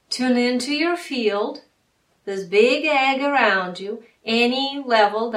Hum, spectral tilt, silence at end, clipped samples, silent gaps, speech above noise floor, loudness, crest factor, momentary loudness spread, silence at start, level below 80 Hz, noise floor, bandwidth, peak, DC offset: none; -3.5 dB/octave; 0 s; under 0.1%; none; 45 dB; -20 LUFS; 20 dB; 14 LU; 0.1 s; -70 dBFS; -66 dBFS; 14 kHz; -2 dBFS; under 0.1%